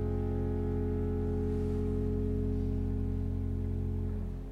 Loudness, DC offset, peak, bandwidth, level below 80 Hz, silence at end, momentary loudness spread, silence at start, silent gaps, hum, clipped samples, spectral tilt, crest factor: -34 LUFS; under 0.1%; -22 dBFS; 4 kHz; -38 dBFS; 0 s; 2 LU; 0 s; none; none; under 0.1%; -10.5 dB/octave; 10 dB